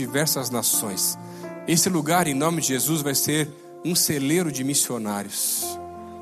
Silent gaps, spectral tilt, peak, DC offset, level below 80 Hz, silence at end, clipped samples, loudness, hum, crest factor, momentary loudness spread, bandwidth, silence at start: none; -3 dB/octave; -6 dBFS; under 0.1%; -64 dBFS; 0 s; under 0.1%; -22 LUFS; none; 18 dB; 11 LU; 14.5 kHz; 0 s